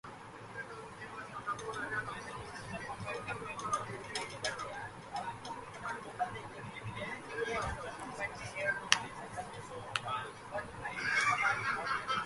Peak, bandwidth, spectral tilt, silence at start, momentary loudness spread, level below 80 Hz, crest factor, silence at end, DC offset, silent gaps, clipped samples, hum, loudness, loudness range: -2 dBFS; 11.5 kHz; -2.5 dB/octave; 0.05 s; 14 LU; -62 dBFS; 36 dB; 0 s; under 0.1%; none; under 0.1%; none; -38 LUFS; 7 LU